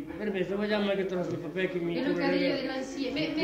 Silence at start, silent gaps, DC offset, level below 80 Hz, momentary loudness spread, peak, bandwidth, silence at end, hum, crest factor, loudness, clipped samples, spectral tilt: 0 s; none; under 0.1%; -60 dBFS; 6 LU; -14 dBFS; 15 kHz; 0 s; none; 16 dB; -30 LUFS; under 0.1%; -6 dB/octave